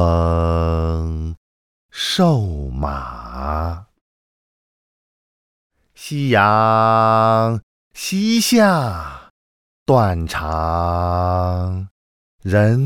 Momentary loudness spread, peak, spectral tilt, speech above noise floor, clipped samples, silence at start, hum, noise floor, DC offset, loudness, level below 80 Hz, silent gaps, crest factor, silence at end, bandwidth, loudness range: 16 LU; -2 dBFS; -6 dB/octave; over 74 dB; under 0.1%; 0 s; none; under -90 dBFS; under 0.1%; -18 LUFS; -36 dBFS; 1.37-1.89 s, 4.01-5.70 s, 7.63-7.91 s, 9.30-9.86 s, 11.91-12.39 s; 18 dB; 0 s; 17.5 kHz; 11 LU